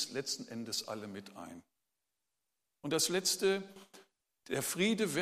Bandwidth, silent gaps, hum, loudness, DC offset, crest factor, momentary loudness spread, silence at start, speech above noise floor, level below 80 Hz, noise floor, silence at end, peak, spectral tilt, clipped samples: 15.5 kHz; none; none; -34 LUFS; under 0.1%; 18 dB; 18 LU; 0 s; 52 dB; -80 dBFS; -88 dBFS; 0 s; -20 dBFS; -3 dB/octave; under 0.1%